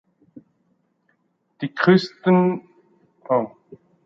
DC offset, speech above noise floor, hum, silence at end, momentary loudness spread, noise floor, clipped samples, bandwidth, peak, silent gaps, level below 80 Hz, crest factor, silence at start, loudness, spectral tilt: under 0.1%; 49 dB; none; 0.3 s; 15 LU; -68 dBFS; under 0.1%; 7 kHz; -2 dBFS; none; -70 dBFS; 22 dB; 1.6 s; -20 LUFS; -8 dB/octave